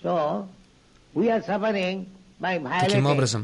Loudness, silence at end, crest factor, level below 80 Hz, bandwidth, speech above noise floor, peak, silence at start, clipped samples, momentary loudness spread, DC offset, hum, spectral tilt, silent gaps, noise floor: -25 LUFS; 0 s; 16 dB; -60 dBFS; 11.5 kHz; 32 dB; -8 dBFS; 0 s; under 0.1%; 13 LU; under 0.1%; none; -5.5 dB/octave; none; -56 dBFS